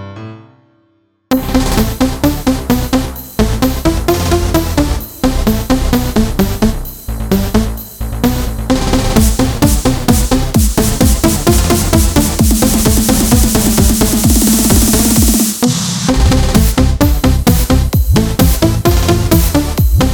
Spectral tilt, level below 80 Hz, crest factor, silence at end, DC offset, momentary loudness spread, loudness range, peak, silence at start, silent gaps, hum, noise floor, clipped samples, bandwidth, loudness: -5 dB/octave; -16 dBFS; 12 dB; 0 s; under 0.1%; 7 LU; 5 LU; 0 dBFS; 0 s; none; none; -56 dBFS; 0.1%; over 20 kHz; -12 LUFS